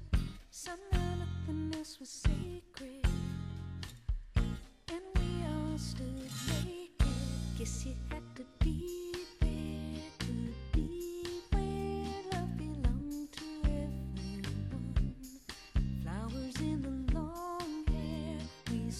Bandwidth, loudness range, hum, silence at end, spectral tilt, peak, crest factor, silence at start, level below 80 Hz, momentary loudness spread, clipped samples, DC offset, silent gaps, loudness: 14.5 kHz; 1 LU; none; 0 s; -6 dB/octave; -18 dBFS; 18 dB; 0 s; -40 dBFS; 8 LU; under 0.1%; under 0.1%; none; -39 LUFS